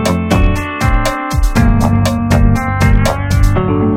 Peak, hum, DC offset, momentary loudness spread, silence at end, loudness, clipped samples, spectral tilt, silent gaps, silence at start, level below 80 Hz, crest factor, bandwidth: 0 dBFS; none; under 0.1%; 4 LU; 0 s; -13 LUFS; under 0.1%; -6.5 dB/octave; none; 0 s; -16 dBFS; 10 dB; 16.5 kHz